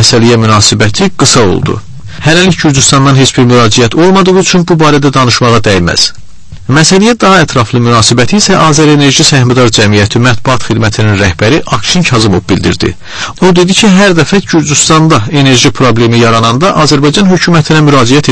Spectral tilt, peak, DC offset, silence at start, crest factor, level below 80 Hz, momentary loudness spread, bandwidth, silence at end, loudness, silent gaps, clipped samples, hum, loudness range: -4.5 dB/octave; 0 dBFS; under 0.1%; 0 s; 6 dB; -30 dBFS; 5 LU; 11 kHz; 0 s; -5 LUFS; none; 4%; none; 2 LU